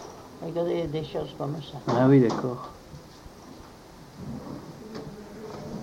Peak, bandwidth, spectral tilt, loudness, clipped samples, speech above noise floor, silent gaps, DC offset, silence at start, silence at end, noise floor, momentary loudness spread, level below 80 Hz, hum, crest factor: -8 dBFS; 16 kHz; -7.5 dB/octave; -26 LUFS; under 0.1%; 22 dB; none; under 0.1%; 0 s; 0 s; -47 dBFS; 26 LU; -56 dBFS; none; 20 dB